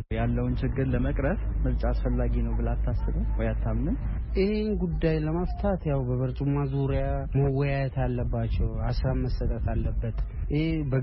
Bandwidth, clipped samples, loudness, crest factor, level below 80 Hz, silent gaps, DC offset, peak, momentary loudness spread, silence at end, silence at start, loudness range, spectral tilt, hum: 5.8 kHz; under 0.1%; -28 LUFS; 14 dB; -30 dBFS; none; under 0.1%; -12 dBFS; 3 LU; 0 s; 0 s; 1 LU; -8 dB/octave; none